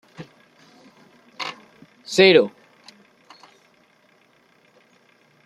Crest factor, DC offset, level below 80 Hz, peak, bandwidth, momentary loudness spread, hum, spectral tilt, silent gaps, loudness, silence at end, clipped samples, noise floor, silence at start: 24 dB; under 0.1%; -72 dBFS; -2 dBFS; 12 kHz; 30 LU; none; -4.5 dB/octave; none; -18 LUFS; 3 s; under 0.1%; -59 dBFS; 0.2 s